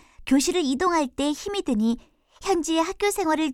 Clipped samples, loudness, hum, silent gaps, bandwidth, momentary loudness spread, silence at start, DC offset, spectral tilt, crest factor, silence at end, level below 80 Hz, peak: under 0.1%; -24 LUFS; none; none; 16.5 kHz; 5 LU; 0.2 s; under 0.1%; -3.5 dB/octave; 14 dB; 0 s; -50 dBFS; -10 dBFS